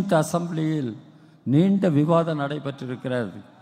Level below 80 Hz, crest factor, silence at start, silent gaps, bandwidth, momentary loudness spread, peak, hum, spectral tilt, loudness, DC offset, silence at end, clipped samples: -66 dBFS; 16 dB; 0 s; none; 15.5 kHz; 13 LU; -6 dBFS; none; -7.5 dB/octave; -23 LUFS; under 0.1%; 0.2 s; under 0.1%